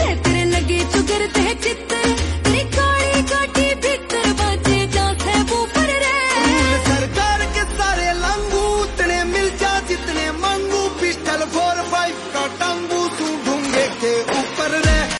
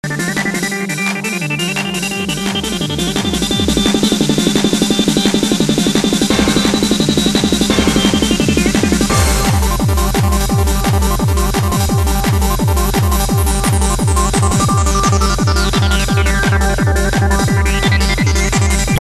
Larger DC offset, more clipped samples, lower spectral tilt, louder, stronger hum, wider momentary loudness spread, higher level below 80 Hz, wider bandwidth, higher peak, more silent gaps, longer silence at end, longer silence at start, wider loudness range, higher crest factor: neither; neither; about the same, -4 dB/octave vs -4.5 dB/octave; second, -18 LUFS vs -14 LUFS; neither; about the same, 5 LU vs 4 LU; second, -28 dBFS vs -20 dBFS; second, 11.5 kHz vs 13.5 kHz; second, -4 dBFS vs 0 dBFS; neither; about the same, 0 s vs 0 s; about the same, 0 s vs 0.05 s; about the same, 3 LU vs 2 LU; about the same, 14 dB vs 14 dB